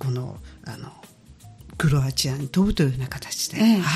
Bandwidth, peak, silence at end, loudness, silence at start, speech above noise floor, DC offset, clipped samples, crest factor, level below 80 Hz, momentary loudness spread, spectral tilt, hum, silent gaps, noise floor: 14.5 kHz; -10 dBFS; 0 s; -23 LUFS; 0 s; 24 dB; under 0.1%; under 0.1%; 14 dB; -42 dBFS; 19 LU; -5 dB/octave; none; none; -47 dBFS